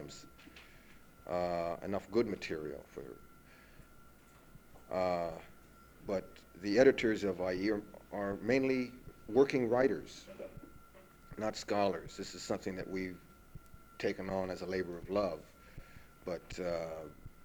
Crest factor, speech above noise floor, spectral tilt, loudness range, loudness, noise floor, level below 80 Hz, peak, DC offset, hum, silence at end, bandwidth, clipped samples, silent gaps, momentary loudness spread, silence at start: 24 dB; 24 dB; -5.5 dB/octave; 8 LU; -36 LUFS; -59 dBFS; -60 dBFS; -14 dBFS; under 0.1%; none; 0 s; over 20 kHz; under 0.1%; none; 24 LU; 0 s